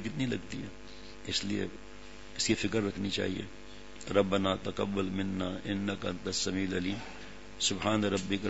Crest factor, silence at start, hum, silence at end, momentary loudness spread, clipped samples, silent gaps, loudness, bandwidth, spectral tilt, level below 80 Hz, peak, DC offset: 24 dB; 0 s; 50 Hz at -50 dBFS; 0 s; 18 LU; under 0.1%; none; -33 LUFS; 8 kHz; -4 dB/octave; -56 dBFS; -10 dBFS; 0.5%